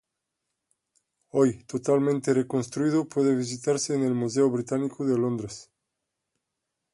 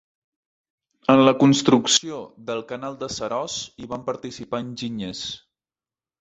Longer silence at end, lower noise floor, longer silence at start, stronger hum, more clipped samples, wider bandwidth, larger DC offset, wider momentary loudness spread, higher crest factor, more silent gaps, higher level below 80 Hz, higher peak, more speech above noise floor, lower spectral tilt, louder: first, 1.3 s vs 0.85 s; second, -83 dBFS vs under -90 dBFS; first, 1.35 s vs 1.1 s; neither; neither; first, 11.5 kHz vs 8.4 kHz; neither; second, 6 LU vs 16 LU; about the same, 18 dB vs 22 dB; neither; second, -68 dBFS vs -60 dBFS; second, -8 dBFS vs -2 dBFS; second, 58 dB vs over 68 dB; first, -6 dB/octave vs -4 dB/octave; second, -26 LUFS vs -22 LUFS